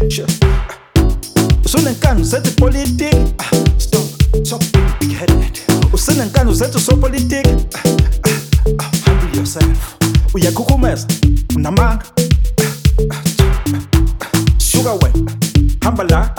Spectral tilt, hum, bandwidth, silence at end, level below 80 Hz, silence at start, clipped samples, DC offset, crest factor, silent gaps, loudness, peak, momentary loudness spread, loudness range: -5.5 dB/octave; none; 19.5 kHz; 0 s; -16 dBFS; 0 s; under 0.1%; under 0.1%; 12 dB; none; -14 LUFS; 0 dBFS; 3 LU; 1 LU